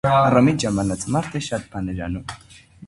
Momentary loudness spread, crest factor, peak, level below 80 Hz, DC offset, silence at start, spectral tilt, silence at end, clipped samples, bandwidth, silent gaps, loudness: 15 LU; 20 dB; -2 dBFS; -42 dBFS; under 0.1%; 0.05 s; -6 dB/octave; 0 s; under 0.1%; 11.5 kHz; none; -21 LUFS